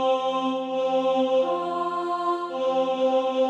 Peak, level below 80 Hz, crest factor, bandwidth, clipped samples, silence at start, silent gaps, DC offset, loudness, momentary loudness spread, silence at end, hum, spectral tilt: -12 dBFS; -76 dBFS; 12 dB; 8.2 kHz; under 0.1%; 0 s; none; under 0.1%; -25 LUFS; 4 LU; 0 s; none; -5 dB/octave